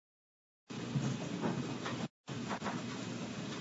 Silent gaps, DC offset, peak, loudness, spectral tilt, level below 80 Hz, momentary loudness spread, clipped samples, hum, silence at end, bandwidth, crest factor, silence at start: 2.10-2.24 s; under 0.1%; -24 dBFS; -40 LUFS; -5 dB/octave; -70 dBFS; 6 LU; under 0.1%; none; 0 s; 7.6 kHz; 18 dB; 0.7 s